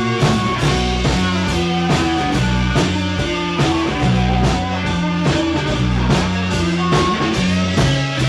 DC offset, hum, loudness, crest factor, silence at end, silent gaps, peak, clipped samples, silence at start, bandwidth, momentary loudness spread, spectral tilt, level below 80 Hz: under 0.1%; none; -17 LUFS; 14 dB; 0 s; none; -2 dBFS; under 0.1%; 0 s; 12 kHz; 3 LU; -5.5 dB/octave; -28 dBFS